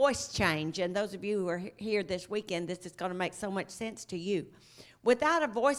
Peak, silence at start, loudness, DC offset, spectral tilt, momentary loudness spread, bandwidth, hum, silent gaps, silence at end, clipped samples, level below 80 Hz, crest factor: -12 dBFS; 0 s; -33 LUFS; under 0.1%; -4.5 dB/octave; 11 LU; 15 kHz; none; none; 0 s; under 0.1%; -62 dBFS; 20 dB